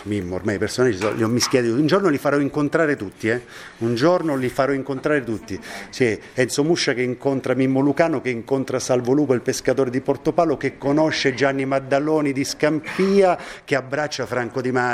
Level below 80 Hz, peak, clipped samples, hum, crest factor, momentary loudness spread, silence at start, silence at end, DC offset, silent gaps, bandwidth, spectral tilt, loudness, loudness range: -54 dBFS; -2 dBFS; under 0.1%; none; 18 dB; 6 LU; 0 s; 0 s; under 0.1%; none; 15 kHz; -5 dB/octave; -21 LUFS; 2 LU